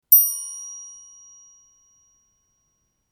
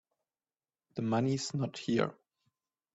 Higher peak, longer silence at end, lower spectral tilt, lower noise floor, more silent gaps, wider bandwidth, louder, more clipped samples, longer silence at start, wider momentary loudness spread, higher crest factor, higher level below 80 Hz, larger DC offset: first, -2 dBFS vs -16 dBFS; first, 2.25 s vs 0.8 s; second, 5 dB/octave vs -6 dB/octave; second, -71 dBFS vs under -90 dBFS; neither; first, over 20 kHz vs 8.4 kHz; first, -18 LUFS vs -34 LUFS; neither; second, 0.1 s vs 0.95 s; first, 29 LU vs 7 LU; about the same, 24 dB vs 20 dB; second, -78 dBFS vs -72 dBFS; neither